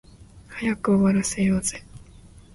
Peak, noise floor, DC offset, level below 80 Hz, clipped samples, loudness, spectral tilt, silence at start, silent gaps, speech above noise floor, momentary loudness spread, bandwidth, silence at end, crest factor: -10 dBFS; -48 dBFS; under 0.1%; -48 dBFS; under 0.1%; -23 LUFS; -5.5 dB/octave; 0.35 s; none; 26 dB; 15 LU; 11.5 kHz; 0.15 s; 16 dB